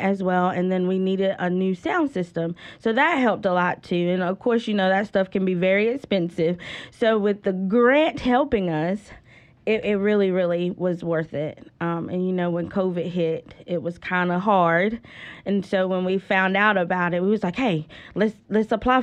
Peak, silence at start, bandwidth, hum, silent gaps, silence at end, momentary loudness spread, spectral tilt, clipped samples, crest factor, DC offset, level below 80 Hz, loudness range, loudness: -6 dBFS; 0 s; 8.6 kHz; none; none; 0 s; 9 LU; -7.5 dB/octave; under 0.1%; 16 dB; under 0.1%; -54 dBFS; 3 LU; -23 LUFS